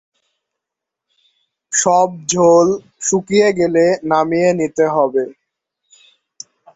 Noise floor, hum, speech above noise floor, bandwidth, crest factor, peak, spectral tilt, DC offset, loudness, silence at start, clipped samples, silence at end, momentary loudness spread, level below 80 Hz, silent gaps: -83 dBFS; none; 69 dB; 8.4 kHz; 16 dB; -2 dBFS; -4 dB/octave; under 0.1%; -15 LUFS; 1.7 s; under 0.1%; 1.45 s; 8 LU; -58 dBFS; none